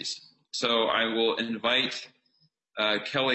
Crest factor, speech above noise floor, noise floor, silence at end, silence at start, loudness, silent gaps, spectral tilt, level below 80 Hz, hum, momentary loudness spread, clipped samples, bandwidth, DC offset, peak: 18 dB; 43 dB; -70 dBFS; 0 s; 0 s; -26 LUFS; none; -3 dB/octave; -72 dBFS; none; 13 LU; under 0.1%; 8.4 kHz; under 0.1%; -10 dBFS